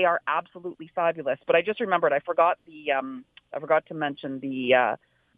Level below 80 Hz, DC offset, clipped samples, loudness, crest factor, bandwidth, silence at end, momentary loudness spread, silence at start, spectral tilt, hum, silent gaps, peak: -76 dBFS; under 0.1%; under 0.1%; -25 LUFS; 18 dB; 4.7 kHz; 0.4 s; 15 LU; 0 s; -7.5 dB/octave; none; none; -8 dBFS